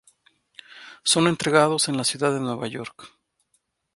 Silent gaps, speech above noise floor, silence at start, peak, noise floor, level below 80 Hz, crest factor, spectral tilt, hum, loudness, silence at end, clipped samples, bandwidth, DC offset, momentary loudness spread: none; 49 dB; 0.75 s; -4 dBFS; -71 dBFS; -64 dBFS; 22 dB; -3.5 dB/octave; none; -22 LUFS; 0.9 s; under 0.1%; 12 kHz; under 0.1%; 18 LU